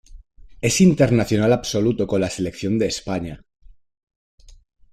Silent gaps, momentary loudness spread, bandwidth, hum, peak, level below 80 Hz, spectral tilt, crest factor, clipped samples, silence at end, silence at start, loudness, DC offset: 4.03-4.07 s, 4.16-4.38 s; 11 LU; 14 kHz; none; -4 dBFS; -44 dBFS; -5.5 dB/octave; 18 dB; under 0.1%; 0.4 s; 0.15 s; -20 LUFS; under 0.1%